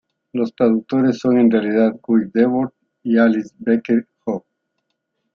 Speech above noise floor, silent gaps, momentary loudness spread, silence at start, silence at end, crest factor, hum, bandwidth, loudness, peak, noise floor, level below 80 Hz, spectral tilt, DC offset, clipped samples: 58 dB; none; 11 LU; 0.35 s; 0.95 s; 16 dB; none; 6.8 kHz; -18 LUFS; -2 dBFS; -74 dBFS; -64 dBFS; -8 dB/octave; under 0.1%; under 0.1%